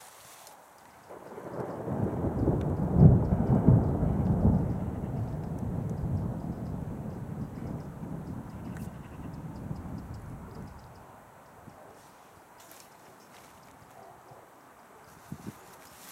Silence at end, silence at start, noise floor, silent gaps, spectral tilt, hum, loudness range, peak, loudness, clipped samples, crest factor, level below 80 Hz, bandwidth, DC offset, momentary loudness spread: 0 s; 0 s; -54 dBFS; none; -9.5 dB/octave; none; 24 LU; -6 dBFS; -30 LUFS; under 0.1%; 26 dB; -42 dBFS; 15.5 kHz; under 0.1%; 27 LU